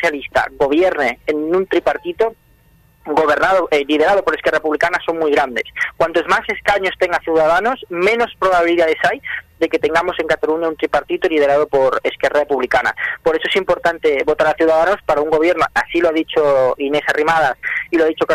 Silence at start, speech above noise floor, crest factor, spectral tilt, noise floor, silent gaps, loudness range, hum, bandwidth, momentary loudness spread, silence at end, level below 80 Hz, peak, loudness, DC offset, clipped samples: 0 s; 36 dB; 16 dB; -4.5 dB/octave; -52 dBFS; none; 2 LU; none; 14 kHz; 5 LU; 0 s; -46 dBFS; 0 dBFS; -16 LUFS; under 0.1%; under 0.1%